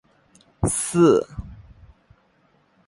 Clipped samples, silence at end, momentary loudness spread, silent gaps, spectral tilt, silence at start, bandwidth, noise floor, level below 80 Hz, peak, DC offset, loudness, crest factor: under 0.1%; 1.3 s; 21 LU; none; -5.5 dB/octave; 0.6 s; 11.5 kHz; -62 dBFS; -42 dBFS; -4 dBFS; under 0.1%; -20 LUFS; 20 dB